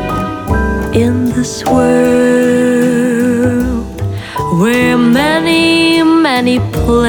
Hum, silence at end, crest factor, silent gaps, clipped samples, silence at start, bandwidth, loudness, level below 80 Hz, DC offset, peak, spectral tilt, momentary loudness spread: none; 0 s; 10 dB; none; under 0.1%; 0 s; 19 kHz; -11 LUFS; -26 dBFS; under 0.1%; 0 dBFS; -5.5 dB/octave; 8 LU